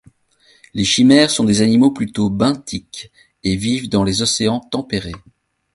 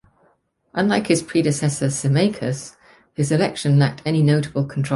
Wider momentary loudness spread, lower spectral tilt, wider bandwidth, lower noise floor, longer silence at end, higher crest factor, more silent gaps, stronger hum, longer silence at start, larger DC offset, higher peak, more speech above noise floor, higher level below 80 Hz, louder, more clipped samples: first, 17 LU vs 9 LU; second, -4.5 dB/octave vs -6 dB/octave; about the same, 11.5 kHz vs 11.5 kHz; second, -55 dBFS vs -62 dBFS; first, 0.55 s vs 0 s; about the same, 16 dB vs 16 dB; neither; neither; about the same, 0.75 s vs 0.75 s; neither; first, 0 dBFS vs -4 dBFS; second, 39 dB vs 43 dB; first, -44 dBFS vs -56 dBFS; first, -16 LUFS vs -20 LUFS; neither